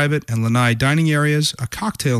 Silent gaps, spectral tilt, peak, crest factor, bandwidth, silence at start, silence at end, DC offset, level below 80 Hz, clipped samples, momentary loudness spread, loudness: none; -5 dB/octave; -6 dBFS; 12 dB; 15 kHz; 0 s; 0 s; under 0.1%; -46 dBFS; under 0.1%; 7 LU; -18 LUFS